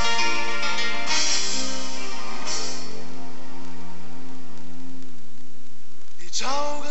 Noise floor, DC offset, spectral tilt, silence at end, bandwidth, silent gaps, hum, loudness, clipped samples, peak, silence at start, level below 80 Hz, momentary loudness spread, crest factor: -52 dBFS; 20%; -1.5 dB/octave; 0 s; 8.4 kHz; none; none; -26 LUFS; under 0.1%; -6 dBFS; 0 s; -68 dBFS; 21 LU; 20 dB